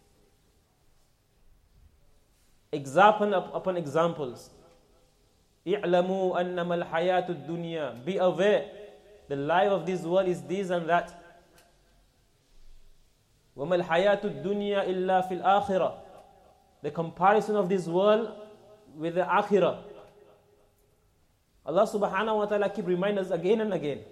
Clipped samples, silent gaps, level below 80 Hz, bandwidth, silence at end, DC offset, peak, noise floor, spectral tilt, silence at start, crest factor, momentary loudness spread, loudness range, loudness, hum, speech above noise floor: under 0.1%; none; -64 dBFS; 13.5 kHz; 0.05 s; under 0.1%; -8 dBFS; -67 dBFS; -6.5 dB/octave; 2.75 s; 22 dB; 14 LU; 4 LU; -27 LUFS; none; 40 dB